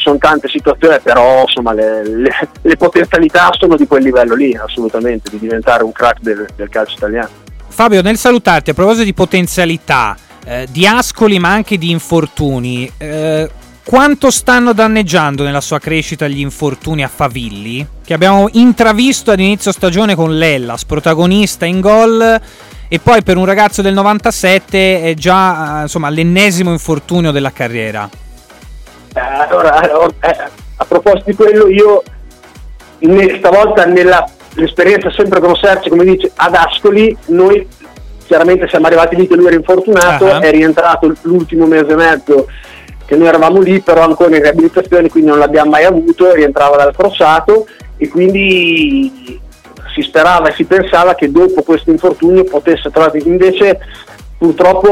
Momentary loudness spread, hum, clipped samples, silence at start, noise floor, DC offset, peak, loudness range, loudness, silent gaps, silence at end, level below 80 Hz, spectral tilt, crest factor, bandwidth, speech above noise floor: 10 LU; none; under 0.1%; 0 s; -33 dBFS; under 0.1%; 0 dBFS; 5 LU; -9 LUFS; none; 0 s; -32 dBFS; -5 dB/octave; 10 dB; 16.5 kHz; 24 dB